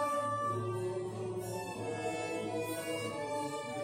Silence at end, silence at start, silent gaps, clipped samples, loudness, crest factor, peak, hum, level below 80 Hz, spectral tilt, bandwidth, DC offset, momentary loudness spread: 0 s; 0 s; none; under 0.1%; -37 LUFS; 14 dB; -22 dBFS; none; -70 dBFS; -5 dB/octave; 16 kHz; under 0.1%; 5 LU